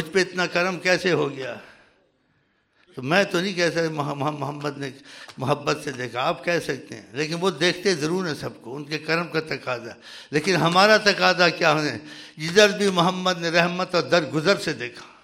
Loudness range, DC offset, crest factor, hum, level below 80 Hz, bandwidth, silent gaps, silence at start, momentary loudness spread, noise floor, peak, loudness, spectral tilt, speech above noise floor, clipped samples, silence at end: 7 LU; under 0.1%; 20 dB; none; -64 dBFS; 16 kHz; none; 0 s; 17 LU; -66 dBFS; -4 dBFS; -22 LUFS; -4 dB/octave; 44 dB; under 0.1%; 0.15 s